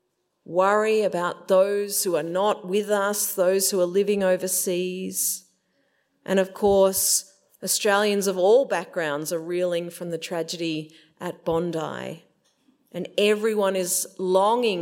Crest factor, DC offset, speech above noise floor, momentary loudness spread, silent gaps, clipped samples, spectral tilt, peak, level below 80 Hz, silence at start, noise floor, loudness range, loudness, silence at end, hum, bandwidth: 18 dB; under 0.1%; 46 dB; 12 LU; none; under 0.1%; -3 dB/octave; -6 dBFS; -62 dBFS; 0.5 s; -69 dBFS; 7 LU; -23 LUFS; 0 s; none; 16.5 kHz